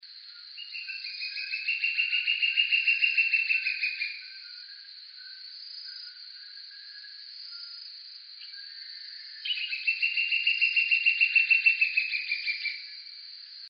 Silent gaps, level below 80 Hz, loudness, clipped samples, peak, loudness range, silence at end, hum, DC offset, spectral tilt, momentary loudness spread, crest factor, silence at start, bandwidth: none; under -90 dBFS; -25 LUFS; under 0.1%; -10 dBFS; 18 LU; 0 s; none; under 0.1%; 16 dB/octave; 21 LU; 20 dB; 0.05 s; 5.8 kHz